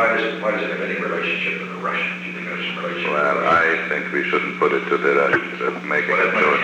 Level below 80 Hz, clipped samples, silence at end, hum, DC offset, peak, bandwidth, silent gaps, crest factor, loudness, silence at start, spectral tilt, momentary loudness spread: -62 dBFS; under 0.1%; 0 s; none; under 0.1%; -4 dBFS; 9.8 kHz; none; 16 dB; -20 LUFS; 0 s; -5.5 dB/octave; 8 LU